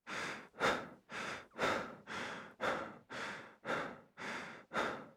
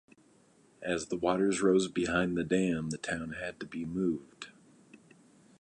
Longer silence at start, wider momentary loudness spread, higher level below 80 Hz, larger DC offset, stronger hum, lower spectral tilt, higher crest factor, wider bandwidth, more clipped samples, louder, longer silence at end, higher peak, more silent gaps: second, 0.05 s vs 0.8 s; second, 10 LU vs 13 LU; second, -72 dBFS vs -60 dBFS; neither; neither; second, -3.5 dB/octave vs -5.5 dB/octave; about the same, 22 dB vs 20 dB; first, 20 kHz vs 10.5 kHz; neither; second, -41 LUFS vs -32 LUFS; second, 0 s vs 0.65 s; second, -20 dBFS vs -12 dBFS; neither